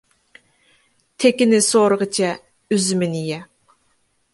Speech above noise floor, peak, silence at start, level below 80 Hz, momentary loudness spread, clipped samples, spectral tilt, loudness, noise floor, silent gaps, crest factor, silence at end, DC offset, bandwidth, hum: 47 dB; -2 dBFS; 1.2 s; -66 dBFS; 13 LU; under 0.1%; -4 dB/octave; -18 LUFS; -64 dBFS; none; 18 dB; 0.9 s; under 0.1%; 12 kHz; none